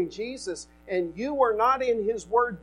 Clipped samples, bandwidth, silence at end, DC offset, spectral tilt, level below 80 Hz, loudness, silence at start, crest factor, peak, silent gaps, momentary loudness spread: under 0.1%; 11.5 kHz; 0 s; under 0.1%; -4.5 dB/octave; -56 dBFS; -26 LUFS; 0 s; 16 dB; -10 dBFS; none; 12 LU